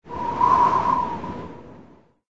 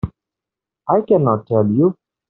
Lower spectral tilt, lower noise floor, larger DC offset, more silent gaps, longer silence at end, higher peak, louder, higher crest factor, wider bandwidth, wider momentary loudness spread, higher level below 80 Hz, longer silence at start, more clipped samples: second, -6.5 dB/octave vs -11.5 dB/octave; second, -50 dBFS vs -86 dBFS; neither; neither; about the same, 0.4 s vs 0.35 s; second, -6 dBFS vs -2 dBFS; second, -20 LUFS vs -16 LUFS; about the same, 16 dB vs 16 dB; first, 7.8 kHz vs 4 kHz; first, 18 LU vs 11 LU; about the same, -50 dBFS vs -46 dBFS; about the same, 0 s vs 0.05 s; neither